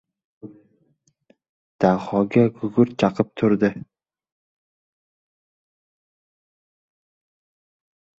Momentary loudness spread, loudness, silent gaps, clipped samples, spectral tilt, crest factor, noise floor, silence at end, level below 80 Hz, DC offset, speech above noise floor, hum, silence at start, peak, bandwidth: 3 LU; -20 LUFS; 1.49-1.79 s; under 0.1%; -8.5 dB/octave; 22 dB; -66 dBFS; 4.4 s; -60 dBFS; under 0.1%; 46 dB; none; 0.45 s; -2 dBFS; 7.6 kHz